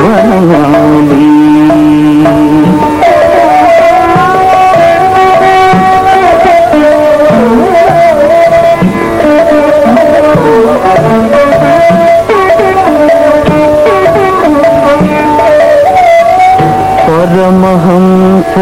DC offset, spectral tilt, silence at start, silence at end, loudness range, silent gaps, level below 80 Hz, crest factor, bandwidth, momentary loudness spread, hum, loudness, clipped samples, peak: 0.7%; -7 dB/octave; 0 s; 0 s; 1 LU; none; -32 dBFS; 4 dB; 16 kHz; 2 LU; none; -5 LUFS; under 0.1%; 0 dBFS